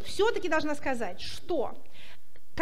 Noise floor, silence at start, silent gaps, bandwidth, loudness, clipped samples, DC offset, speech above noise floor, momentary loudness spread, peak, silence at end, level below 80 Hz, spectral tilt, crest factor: -58 dBFS; 0 s; none; 16 kHz; -31 LUFS; under 0.1%; 4%; 27 dB; 22 LU; -12 dBFS; 0 s; -56 dBFS; -4 dB/octave; 20 dB